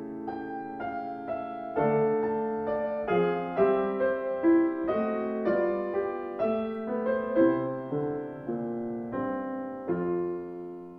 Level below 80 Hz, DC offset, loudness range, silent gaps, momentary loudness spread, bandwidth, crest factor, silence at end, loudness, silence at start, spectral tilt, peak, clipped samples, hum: -62 dBFS; under 0.1%; 3 LU; none; 11 LU; 4.5 kHz; 16 dB; 0 s; -29 LUFS; 0 s; -10 dB/octave; -12 dBFS; under 0.1%; none